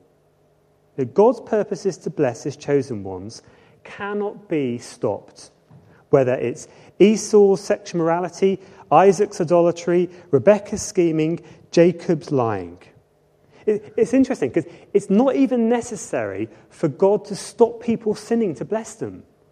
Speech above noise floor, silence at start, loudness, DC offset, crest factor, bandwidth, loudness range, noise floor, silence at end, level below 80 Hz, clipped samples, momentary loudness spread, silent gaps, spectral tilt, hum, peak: 40 dB; 1 s; -20 LUFS; under 0.1%; 20 dB; 11.5 kHz; 7 LU; -59 dBFS; 0.35 s; -60 dBFS; under 0.1%; 14 LU; none; -6 dB/octave; none; 0 dBFS